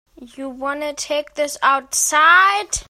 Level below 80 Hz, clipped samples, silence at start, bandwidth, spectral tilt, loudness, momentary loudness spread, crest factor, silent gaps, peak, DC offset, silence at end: -48 dBFS; under 0.1%; 0.2 s; 16 kHz; 0 dB/octave; -16 LUFS; 15 LU; 16 dB; none; -2 dBFS; under 0.1%; 0.05 s